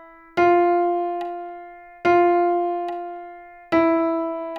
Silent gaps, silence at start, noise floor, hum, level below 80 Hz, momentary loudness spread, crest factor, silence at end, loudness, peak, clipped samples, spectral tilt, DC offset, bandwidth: none; 0 s; -41 dBFS; none; -60 dBFS; 18 LU; 14 dB; 0 s; -21 LUFS; -6 dBFS; under 0.1%; -7 dB/octave; under 0.1%; 6.2 kHz